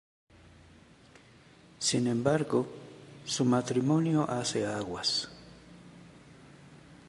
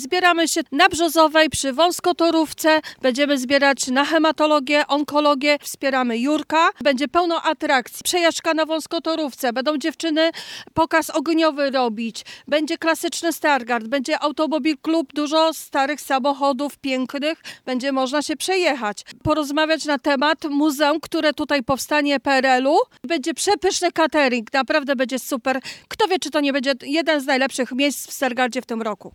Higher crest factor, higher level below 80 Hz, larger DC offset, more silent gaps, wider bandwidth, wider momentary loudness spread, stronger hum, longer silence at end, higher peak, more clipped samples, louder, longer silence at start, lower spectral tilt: about the same, 22 dB vs 18 dB; second, -66 dBFS vs -58 dBFS; neither; neither; second, 11.5 kHz vs 17.5 kHz; first, 21 LU vs 7 LU; neither; about the same, 0.15 s vs 0.05 s; second, -10 dBFS vs 0 dBFS; neither; second, -30 LUFS vs -20 LUFS; first, 1.8 s vs 0 s; first, -4.5 dB/octave vs -2.5 dB/octave